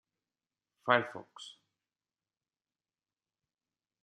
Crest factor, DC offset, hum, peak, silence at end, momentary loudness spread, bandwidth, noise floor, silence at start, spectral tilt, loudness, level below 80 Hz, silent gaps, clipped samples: 32 dB; under 0.1%; none; -10 dBFS; 2.5 s; 20 LU; 11 kHz; under -90 dBFS; 0.85 s; -4.5 dB/octave; -32 LUFS; under -90 dBFS; none; under 0.1%